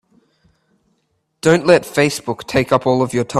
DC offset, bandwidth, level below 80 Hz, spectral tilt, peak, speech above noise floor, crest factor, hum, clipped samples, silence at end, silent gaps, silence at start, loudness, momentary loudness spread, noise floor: under 0.1%; 14.5 kHz; -50 dBFS; -5.5 dB/octave; 0 dBFS; 52 dB; 18 dB; none; under 0.1%; 0 s; none; 1.45 s; -16 LUFS; 7 LU; -67 dBFS